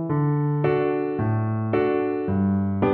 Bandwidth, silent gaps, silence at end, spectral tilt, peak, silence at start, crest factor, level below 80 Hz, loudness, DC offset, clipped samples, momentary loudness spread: 4.3 kHz; none; 0 s; -12 dB/octave; -10 dBFS; 0 s; 14 dB; -54 dBFS; -23 LUFS; under 0.1%; under 0.1%; 2 LU